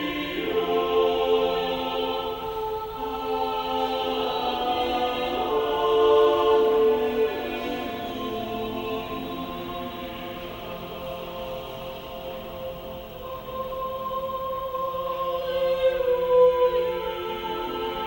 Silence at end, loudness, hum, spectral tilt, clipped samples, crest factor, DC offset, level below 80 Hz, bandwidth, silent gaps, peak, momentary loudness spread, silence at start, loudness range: 0 s; -26 LUFS; none; -5.5 dB/octave; under 0.1%; 16 dB; under 0.1%; -50 dBFS; 17 kHz; none; -10 dBFS; 15 LU; 0 s; 12 LU